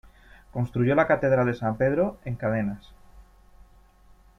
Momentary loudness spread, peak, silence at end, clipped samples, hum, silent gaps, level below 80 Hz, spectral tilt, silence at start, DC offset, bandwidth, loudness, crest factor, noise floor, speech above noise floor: 11 LU; -8 dBFS; 1.2 s; under 0.1%; none; none; -50 dBFS; -9 dB/octave; 0.55 s; under 0.1%; 6.4 kHz; -25 LUFS; 20 dB; -55 dBFS; 31 dB